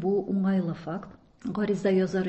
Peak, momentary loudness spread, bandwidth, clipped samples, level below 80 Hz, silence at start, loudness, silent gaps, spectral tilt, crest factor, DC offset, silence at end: -12 dBFS; 12 LU; 8.2 kHz; under 0.1%; -60 dBFS; 0 s; -28 LUFS; none; -8 dB/octave; 14 dB; under 0.1%; 0 s